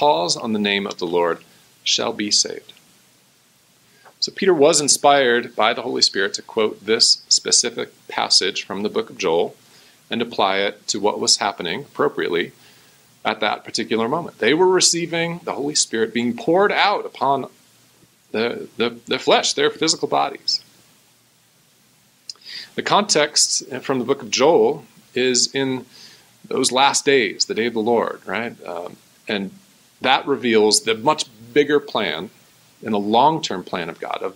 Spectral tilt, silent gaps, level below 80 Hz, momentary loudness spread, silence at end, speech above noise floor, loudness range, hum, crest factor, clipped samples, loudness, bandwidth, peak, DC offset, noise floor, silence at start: -2 dB/octave; none; -70 dBFS; 13 LU; 0.05 s; 38 dB; 5 LU; none; 20 dB; under 0.1%; -19 LUFS; 16 kHz; 0 dBFS; under 0.1%; -57 dBFS; 0 s